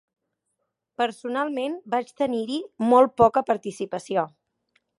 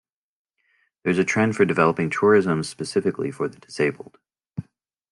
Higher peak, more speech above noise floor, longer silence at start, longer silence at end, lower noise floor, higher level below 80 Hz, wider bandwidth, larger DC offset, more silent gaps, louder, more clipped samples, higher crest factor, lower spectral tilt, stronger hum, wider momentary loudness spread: about the same, -4 dBFS vs -4 dBFS; first, 55 dB vs 46 dB; about the same, 1 s vs 1.05 s; first, 0.7 s vs 0.5 s; first, -79 dBFS vs -67 dBFS; about the same, -62 dBFS vs -64 dBFS; about the same, 11.5 kHz vs 11 kHz; neither; neither; about the same, -24 LUFS vs -22 LUFS; neither; about the same, 20 dB vs 20 dB; about the same, -5.5 dB/octave vs -6 dB/octave; neither; second, 13 LU vs 19 LU